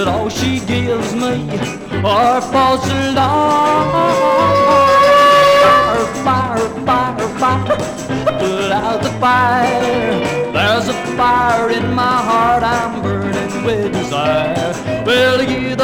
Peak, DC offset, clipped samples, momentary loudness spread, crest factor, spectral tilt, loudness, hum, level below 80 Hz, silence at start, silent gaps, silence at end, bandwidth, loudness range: -2 dBFS; 0.2%; under 0.1%; 9 LU; 12 dB; -5 dB/octave; -14 LUFS; none; -40 dBFS; 0 s; none; 0 s; 18.5 kHz; 5 LU